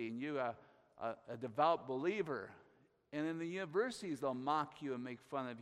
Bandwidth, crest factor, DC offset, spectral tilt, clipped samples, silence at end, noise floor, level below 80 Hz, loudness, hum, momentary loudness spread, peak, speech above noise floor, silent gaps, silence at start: 13.5 kHz; 20 dB; under 0.1%; -6 dB/octave; under 0.1%; 0 s; -70 dBFS; -84 dBFS; -41 LUFS; none; 11 LU; -22 dBFS; 30 dB; none; 0 s